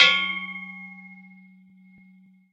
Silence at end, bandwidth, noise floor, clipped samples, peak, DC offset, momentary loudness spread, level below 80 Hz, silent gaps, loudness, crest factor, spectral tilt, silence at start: 1.4 s; 9.4 kHz; -55 dBFS; under 0.1%; -2 dBFS; under 0.1%; 25 LU; -86 dBFS; none; -24 LUFS; 26 dB; -1 dB/octave; 0 s